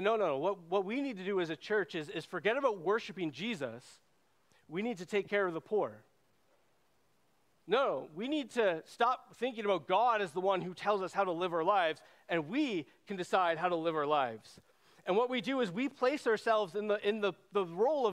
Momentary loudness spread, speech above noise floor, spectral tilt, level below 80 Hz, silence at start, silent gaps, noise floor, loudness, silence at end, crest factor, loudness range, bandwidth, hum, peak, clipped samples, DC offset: 8 LU; 41 dB; -5.5 dB/octave; -84 dBFS; 0 s; none; -74 dBFS; -34 LUFS; 0 s; 20 dB; 5 LU; 13 kHz; none; -14 dBFS; under 0.1%; under 0.1%